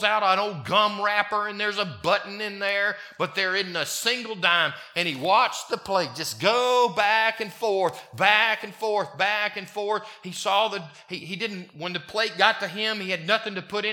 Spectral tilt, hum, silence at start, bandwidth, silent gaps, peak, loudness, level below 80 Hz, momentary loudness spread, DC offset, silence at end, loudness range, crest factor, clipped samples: -2.5 dB/octave; none; 0 s; 19 kHz; none; -2 dBFS; -24 LUFS; -72 dBFS; 10 LU; under 0.1%; 0 s; 4 LU; 22 dB; under 0.1%